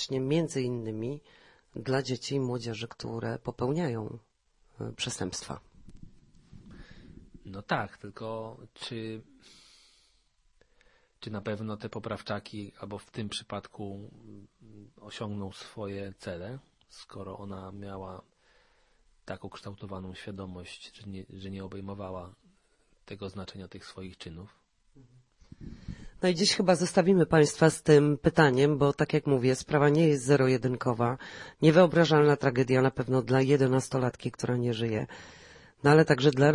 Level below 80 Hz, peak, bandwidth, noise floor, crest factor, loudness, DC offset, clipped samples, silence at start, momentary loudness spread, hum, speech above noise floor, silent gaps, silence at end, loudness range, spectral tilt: -60 dBFS; -8 dBFS; 11.5 kHz; -68 dBFS; 22 dB; -27 LUFS; under 0.1%; under 0.1%; 0 s; 22 LU; none; 40 dB; none; 0 s; 19 LU; -6 dB/octave